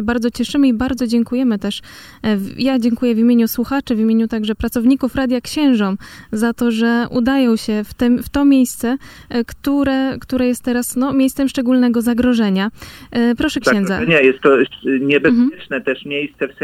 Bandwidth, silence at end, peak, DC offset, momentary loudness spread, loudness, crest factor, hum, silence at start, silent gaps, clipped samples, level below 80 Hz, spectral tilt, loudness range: 15.5 kHz; 0 s; 0 dBFS; under 0.1%; 8 LU; -16 LUFS; 16 dB; none; 0 s; none; under 0.1%; -42 dBFS; -5.5 dB/octave; 2 LU